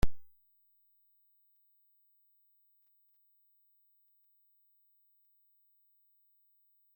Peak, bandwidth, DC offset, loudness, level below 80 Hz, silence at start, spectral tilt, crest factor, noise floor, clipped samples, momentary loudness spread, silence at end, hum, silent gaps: -14 dBFS; 16.5 kHz; under 0.1%; -59 LUFS; -50 dBFS; 0.05 s; -6 dB/octave; 24 dB; -71 dBFS; under 0.1%; 0 LU; 6.75 s; 50 Hz at -120 dBFS; none